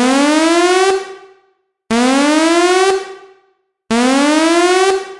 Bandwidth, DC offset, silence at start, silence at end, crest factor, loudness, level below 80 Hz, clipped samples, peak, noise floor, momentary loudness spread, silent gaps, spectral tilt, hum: 11.5 kHz; under 0.1%; 0 s; 0 s; 12 dB; -12 LUFS; -54 dBFS; under 0.1%; 0 dBFS; -60 dBFS; 8 LU; none; -2.5 dB/octave; none